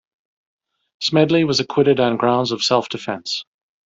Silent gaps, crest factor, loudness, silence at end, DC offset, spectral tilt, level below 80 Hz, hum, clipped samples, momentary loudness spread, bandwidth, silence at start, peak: none; 18 dB; -18 LUFS; 0.45 s; under 0.1%; -5 dB/octave; -60 dBFS; none; under 0.1%; 10 LU; 7.8 kHz; 1 s; -2 dBFS